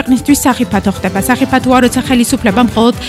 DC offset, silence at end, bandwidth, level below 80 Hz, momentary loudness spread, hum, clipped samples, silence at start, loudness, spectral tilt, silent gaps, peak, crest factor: under 0.1%; 0 s; 15 kHz; -32 dBFS; 4 LU; none; under 0.1%; 0 s; -11 LUFS; -4.5 dB/octave; none; 0 dBFS; 10 dB